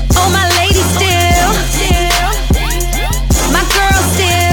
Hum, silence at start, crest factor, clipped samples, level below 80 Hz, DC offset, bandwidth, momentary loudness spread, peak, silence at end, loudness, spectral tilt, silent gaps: none; 0 s; 10 dB; under 0.1%; -16 dBFS; under 0.1%; over 20 kHz; 4 LU; 0 dBFS; 0 s; -11 LUFS; -3.5 dB/octave; none